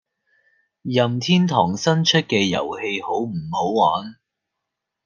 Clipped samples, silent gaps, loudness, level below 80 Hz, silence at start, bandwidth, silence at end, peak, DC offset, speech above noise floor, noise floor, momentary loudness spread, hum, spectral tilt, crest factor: under 0.1%; none; -20 LUFS; -62 dBFS; 0.85 s; 7.4 kHz; 0.9 s; -2 dBFS; under 0.1%; 62 dB; -81 dBFS; 8 LU; none; -5 dB/octave; 20 dB